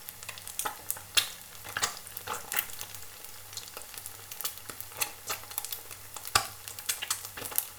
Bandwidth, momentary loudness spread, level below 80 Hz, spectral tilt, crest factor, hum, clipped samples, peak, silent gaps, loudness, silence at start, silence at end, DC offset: over 20 kHz; 13 LU; -62 dBFS; 0.5 dB/octave; 34 dB; none; under 0.1%; -2 dBFS; none; -34 LUFS; 0 s; 0 s; under 0.1%